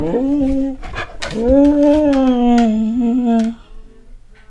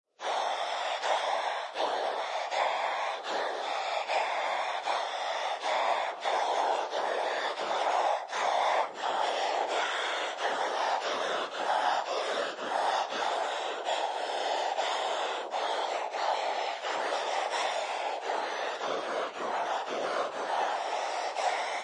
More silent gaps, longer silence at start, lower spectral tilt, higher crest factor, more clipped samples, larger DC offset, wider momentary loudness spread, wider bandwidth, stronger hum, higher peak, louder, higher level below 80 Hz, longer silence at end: neither; second, 0 s vs 0.2 s; first, -7 dB/octave vs -0.5 dB/octave; about the same, 14 dB vs 16 dB; neither; neither; first, 12 LU vs 4 LU; second, 10 kHz vs 11.5 kHz; neither; first, 0 dBFS vs -14 dBFS; first, -15 LUFS vs -31 LUFS; first, -32 dBFS vs under -90 dBFS; first, 0.35 s vs 0 s